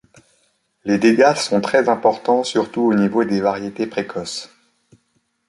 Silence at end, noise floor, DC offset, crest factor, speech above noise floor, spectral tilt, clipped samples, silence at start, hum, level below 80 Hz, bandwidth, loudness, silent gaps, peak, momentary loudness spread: 1.05 s; -67 dBFS; under 0.1%; 18 dB; 49 dB; -5 dB/octave; under 0.1%; 0.85 s; none; -60 dBFS; 11.5 kHz; -18 LUFS; none; -2 dBFS; 11 LU